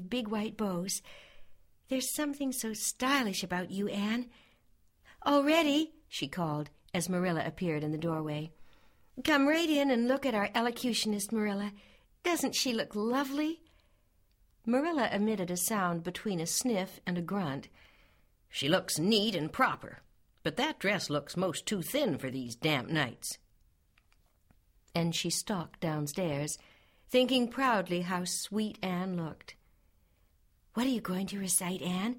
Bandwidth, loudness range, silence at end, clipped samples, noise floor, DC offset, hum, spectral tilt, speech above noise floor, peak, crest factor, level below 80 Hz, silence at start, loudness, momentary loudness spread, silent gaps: 16.5 kHz; 5 LU; 0 s; under 0.1%; -68 dBFS; under 0.1%; none; -4 dB/octave; 36 dB; -12 dBFS; 20 dB; -64 dBFS; 0 s; -32 LUFS; 10 LU; none